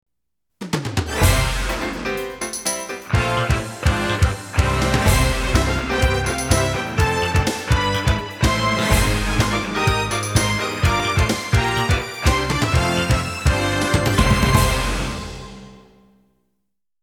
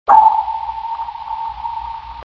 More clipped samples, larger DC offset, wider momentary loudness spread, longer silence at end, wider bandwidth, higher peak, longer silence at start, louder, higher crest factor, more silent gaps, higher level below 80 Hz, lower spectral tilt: neither; neither; second, 7 LU vs 17 LU; first, 1.25 s vs 0.1 s; first, 18 kHz vs 7.4 kHz; about the same, 0 dBFS vs 0 dBFS; first, 0.6 s vs 0.05 s; about the same, -19 LUFS vs -18 LUFS; about the same, 20 dB vs 16 dB; neither; first, -26 dBFS vs -44 dBFS; about the same, -4.5 dB/octave vs -5 dB/octave